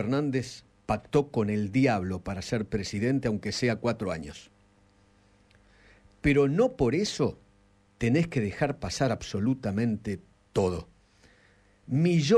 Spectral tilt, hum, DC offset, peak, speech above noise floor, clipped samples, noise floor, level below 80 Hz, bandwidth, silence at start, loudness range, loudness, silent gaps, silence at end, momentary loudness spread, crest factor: -6.5 dB/octave; none; under 0.1%; -12 dBFS; 36 dB; under 0.1%; -63 dBFS; -50 dBFS; 12.5 kHz; 0 s; 4 LU; -28 LUFS; none; 0 s; 9 LU; 18 dB